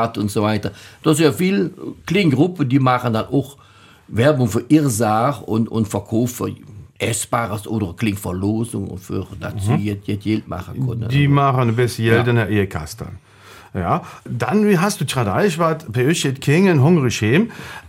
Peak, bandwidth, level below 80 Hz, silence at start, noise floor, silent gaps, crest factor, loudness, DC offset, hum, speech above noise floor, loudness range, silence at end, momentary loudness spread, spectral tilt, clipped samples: 0 dBFS; 17 kHz; -48 dBFS; 0 s; -44 dBFS; none; 18 dB; -18 LUFS; under 0.1%; none; 26 dB; 5 LU; 0 s; 12 LU; -6 dB/octave; under 0.1%